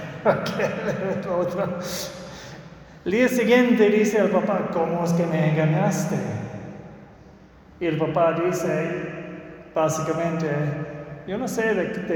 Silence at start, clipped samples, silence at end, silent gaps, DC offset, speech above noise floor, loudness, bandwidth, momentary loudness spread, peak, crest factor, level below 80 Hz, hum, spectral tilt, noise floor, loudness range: 0 s; under 0.1%; 0 s; none; under 0.1%; 26 dB; -23 LUFS; 19 kHz; 18 LU; -4 dBFS; 18 dB; -56 dBFS; none; -6 dB/octave; -48 dBFS; 6 LU